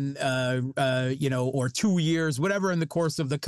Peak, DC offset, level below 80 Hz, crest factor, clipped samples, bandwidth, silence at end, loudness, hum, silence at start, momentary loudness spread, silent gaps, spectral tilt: -16 dBFS; under 0.1%; -66 dBFS; 10 dB; under 0.1%; 12.5 kHz; 0 s; -26 LUFS; none; 0 s; 3 LU; none; -5.5 dB/octave